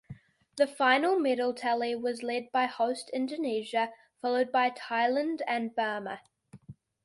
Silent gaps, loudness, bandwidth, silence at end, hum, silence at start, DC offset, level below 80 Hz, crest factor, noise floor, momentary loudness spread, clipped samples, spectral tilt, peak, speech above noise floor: none; -30 LUFS; 11.5 kHz; 0.3 s; none; 0.1 s; under 0.1%; -74 dBFS; 20 dB; -52 dBFS; 9 LU; under 0.1%; -4 dB/octave; -10 dBFS; 23 dB